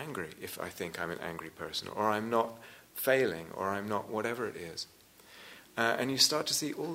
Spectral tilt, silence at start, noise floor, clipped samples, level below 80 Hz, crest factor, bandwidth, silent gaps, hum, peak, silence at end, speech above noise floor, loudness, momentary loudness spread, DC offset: -2.5 dB/octave; 0 s; -56 dBFS; under 0.1%; -72 dBFS; 22 dB; 16 kHz; none; none; -12 dBFS; 0 s; 22 dB; -33 LUFS; 16 LU; under 0.1%